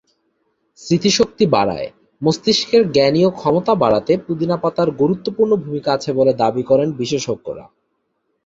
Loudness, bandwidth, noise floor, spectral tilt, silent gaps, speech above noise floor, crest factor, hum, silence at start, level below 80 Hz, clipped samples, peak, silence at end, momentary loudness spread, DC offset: -17 LUFS; 7.8 kHz; -70 dBFS; -5.5 dB/octave; none; 53 dB; 16 dB; none; 0.8 s; -52 dBFS; under 0.1%; 0 dBFS; 0.85 s; 7 LU; under 0.1%